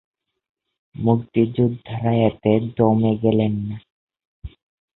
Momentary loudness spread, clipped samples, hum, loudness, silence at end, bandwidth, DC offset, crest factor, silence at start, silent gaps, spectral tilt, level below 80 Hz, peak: 7 LU; under 0.1%; none; -20 LUFS; 0.45 s; 4.1 kHz; under 0.1%; 18 dB; 1 s; 3.90-4.07 s, 4.27-4.42 s; -13 dB/octave; -48 dBFS; -2 dBFS